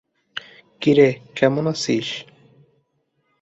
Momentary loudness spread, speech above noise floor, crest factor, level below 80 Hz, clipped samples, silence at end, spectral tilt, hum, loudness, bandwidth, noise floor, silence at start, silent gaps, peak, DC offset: 19 LU; 51 dB; 20 dB; -62 dBFS; under 0.1%; 1.2 s; -5.5 dB/octave; none; -19 LUFS; 8.2 kHz; -69 dBFS; 0.35 s; none; -2 dBFS; under 0.1%